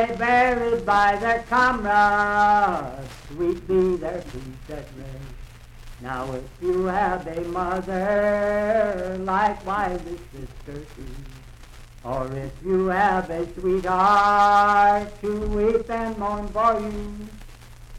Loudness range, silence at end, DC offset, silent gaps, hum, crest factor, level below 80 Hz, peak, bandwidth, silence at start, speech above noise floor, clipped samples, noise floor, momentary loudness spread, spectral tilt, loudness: 9 LU; 0 s; under 0.1%; none; none; 16 dB; -40 dBFS; -6 dBFS; 14.5 kHz; 0 s; 21 dB; under 0.1%; -43 dBFS; 20 LU; -6 dB/octave; -22 LUFS